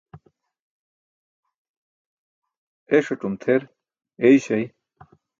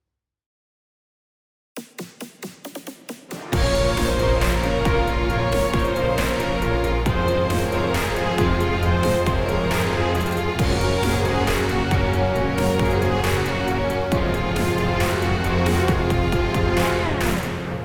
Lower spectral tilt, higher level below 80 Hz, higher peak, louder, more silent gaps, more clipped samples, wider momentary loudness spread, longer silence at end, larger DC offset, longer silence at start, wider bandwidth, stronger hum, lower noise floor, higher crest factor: about the same, -6.5 dB/octave vs -5.5 dB/octave; second, -68 dBFS vs -30 dBFS; about the same, -4 dBFS vs -6 dBFS; about the same, -21 LUFS vs -21 LUFS; first, 0.60-1.43 s, 1.56-2.42 s, 2.57-2.86 s vs none; neither; second, 10 LU vs 15 LU; first, 0.7 s vs 0 s; second, under 0.1% vs 0.2%; second, 0.15 s vs 1.75 s; second, 7.6 kHz vs over 20 kHz; neither; second, -55 dBFS vs under -90 dBFS; first, 22 dB vs 14 dB